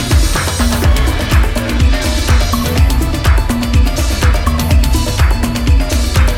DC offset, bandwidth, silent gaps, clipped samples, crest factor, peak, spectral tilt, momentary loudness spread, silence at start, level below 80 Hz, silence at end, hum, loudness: under 0.1%; 17 kHz; none; under 0.1%; 10 dB; 0 dBFS; -5 dB/octave; 2 LU; 0 s; -12 dBFS; 0 s; none; -13 LUFS